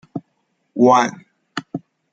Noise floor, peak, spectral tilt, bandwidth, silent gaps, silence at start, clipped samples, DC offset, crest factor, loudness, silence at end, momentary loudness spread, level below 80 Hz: -68 dBFS; -2 dBFS; -5.5 dB/octave; 7.8 kHz; none; 0.15 s; under 0.1%; under 0.1%; 18 dB; -17 LUFS; 0.35 s; 20 LU; -68 dBFS